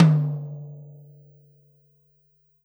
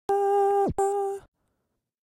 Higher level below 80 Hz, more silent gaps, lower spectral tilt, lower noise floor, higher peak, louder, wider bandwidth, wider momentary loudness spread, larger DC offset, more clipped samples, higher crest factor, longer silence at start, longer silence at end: second, -76 dBFS vs -54 dBFS; neither; first, -9.5 dB/octave vs -6 dB/octave; second, -64 dBFS vs -79 dBFS; first, -4 dBFS vs -16 dBFS; about the same, -25 LUFS vs -25 LUFS; first, over 20 kHz vs 16 kHz; first, 26 LU vs 10 LU; neither; neither; first, 22 dB vs 12 dB; about the same, 0 s vs 0.1 s; first, 1.8 s vs 0.95 s